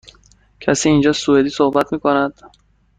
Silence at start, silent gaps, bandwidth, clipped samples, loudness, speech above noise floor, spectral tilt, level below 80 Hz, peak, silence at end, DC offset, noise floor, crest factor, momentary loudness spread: 0.6 s; none; 9.4 kHz; under 0.1%; -16 LUFS; 36 dB; -5 dB/octave; -48 dBFS; -2 dBFS; 0.5 s; under 0.1%; -51 dBFS; 16 dB; 6 LU